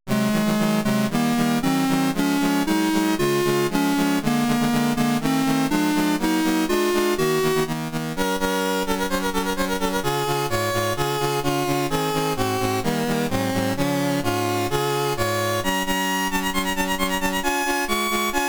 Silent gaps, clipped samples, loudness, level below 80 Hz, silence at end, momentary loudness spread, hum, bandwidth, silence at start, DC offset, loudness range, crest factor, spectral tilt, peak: none; under 0.1%; -22 LUFS; -42 dBFS; 0 s; 2 LU; none; over 20 kHz; 0.05 s; 0.2%; 2 LU; 12 dB; -4.5 dB/octave; -8 dBFS